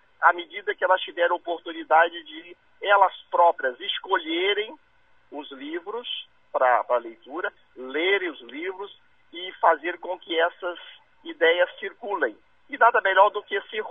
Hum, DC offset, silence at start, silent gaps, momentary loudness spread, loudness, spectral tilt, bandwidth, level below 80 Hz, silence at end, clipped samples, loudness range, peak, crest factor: none; under 0.1%; 0.2 s; none; 18 LU; -24 LUFS; -4 dB/octave; 3.9 kHz; -76 dBFS; 0 s; under 0.1%; 5 LU; -4 dBFS; 22 dB